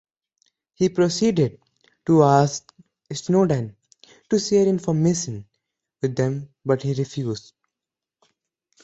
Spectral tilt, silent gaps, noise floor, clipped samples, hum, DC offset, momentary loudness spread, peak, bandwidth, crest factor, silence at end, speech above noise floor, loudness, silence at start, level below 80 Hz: -6 dB/octave; none; -88 dBFS; under 0.1%; none; under 0.1%; 15 LU; -2 dBFS; 8.2 kHz; 20 dB; 1.45 s; 67 dB; -21 LUFS; 0.8 s; -58 dBFS